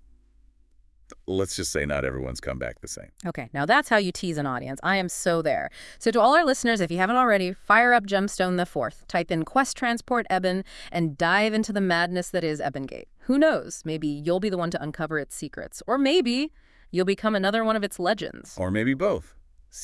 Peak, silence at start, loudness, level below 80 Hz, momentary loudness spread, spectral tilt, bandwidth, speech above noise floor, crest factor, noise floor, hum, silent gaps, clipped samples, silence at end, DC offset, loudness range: -4 dBFS; 1.1 s; -24 LUFS; -50 dBFS; 13 LU; -4.5 dB/octave; 12 kHz; 34 dB; 20 dB; -58 dBFS; none; none; under 0.1%; 0 s; under 0.1%; 5 LU